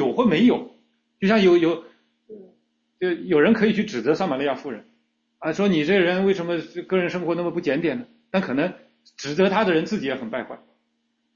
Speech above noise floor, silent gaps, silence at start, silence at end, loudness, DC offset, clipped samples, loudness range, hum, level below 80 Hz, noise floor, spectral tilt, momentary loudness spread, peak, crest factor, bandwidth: 51 dB; none; 0 s; 0.8 s; -22 LUFS; under 0.1%; under 0.1%; 3 LU; none; -62 dBFS; -72 dBFS; -6.5 dB/octave; 14 LU; -4 dBFS; 18 dB; 7.2 kHz